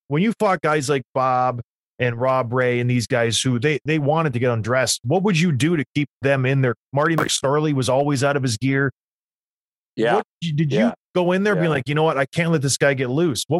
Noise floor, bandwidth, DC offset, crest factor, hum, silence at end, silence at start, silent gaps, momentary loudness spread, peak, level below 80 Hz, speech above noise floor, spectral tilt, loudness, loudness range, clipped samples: under -90 dBFS; 13 kHz; under 0.1%; 16 dB; none; 0 s; 0.1 s; 1.05-1.14 s, 1.64-1.98 s, 5.87-5.95 s, 6.09-6.20 s, 6.76-6.92 s, 8.92-9.96 s, 10.25-10.41 s, 10.98-11.14 s; 4 LU; -4 dBFS; -60 dBFS; over 70 dB; -5 dB/octave; -20 LUFS; 2 LU; under 0.1%